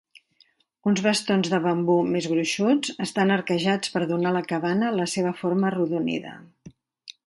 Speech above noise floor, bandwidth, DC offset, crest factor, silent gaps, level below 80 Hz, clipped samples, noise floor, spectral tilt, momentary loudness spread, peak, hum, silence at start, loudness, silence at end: 40 dB; 11.5 kHz; under 0.1%; 16 dB; none; -68 dBFS; under 0.1%; -63 dBFS; -5 dB/octave; 4 LU; -8 dBFS; none; 0.85 s; -24 LUFS; 0.15 s